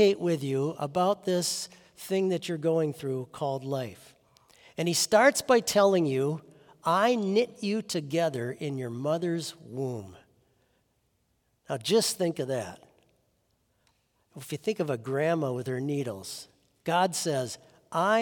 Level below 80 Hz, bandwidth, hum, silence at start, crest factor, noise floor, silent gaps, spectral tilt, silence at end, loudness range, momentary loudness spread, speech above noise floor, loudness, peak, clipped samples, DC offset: -74 dBFS; 18 kHz; none; 0 s; 20 dB; -73 dBFS; none; -4.5 dB/octave; 0 s; 8 LU; 14 LU; 45 dB; -28 LUFS; -8 dBFS; under 0.1%; under 0.1%